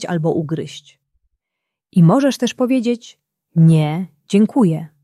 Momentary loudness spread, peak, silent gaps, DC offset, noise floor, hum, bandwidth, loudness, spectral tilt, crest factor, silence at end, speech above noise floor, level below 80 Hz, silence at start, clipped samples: 13 LU; -2 dBFS; none; under 0.1%; -80 dBFS; none; 12 kHz; -16 LUFS; -7.5 dB/octave; 14 dB; 0.15 s; 65 dB; -62 dBFS; 0 s; under 0.1%